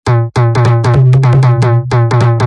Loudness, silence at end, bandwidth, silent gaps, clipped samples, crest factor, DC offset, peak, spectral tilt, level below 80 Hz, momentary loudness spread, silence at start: -9 LUFS; 0 s; 9.6 kHz; none; under 0.1%; 8 dB; under 0.1%; 0 dBFS; -8 dB/octave; -36 dBFS; 3 LU; 0.05 s